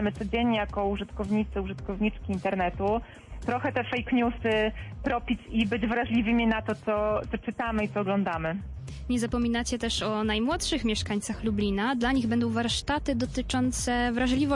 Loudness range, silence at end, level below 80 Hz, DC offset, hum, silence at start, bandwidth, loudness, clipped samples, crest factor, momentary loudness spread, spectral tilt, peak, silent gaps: 2 LU; 0 s; -42 dBFS; under 0.1%; none; 0 s; 11.5 kHz; -28 LUFS; under 0.1%; 14 dB; 6 LU; -5 dB/octave; -14 dBFS; none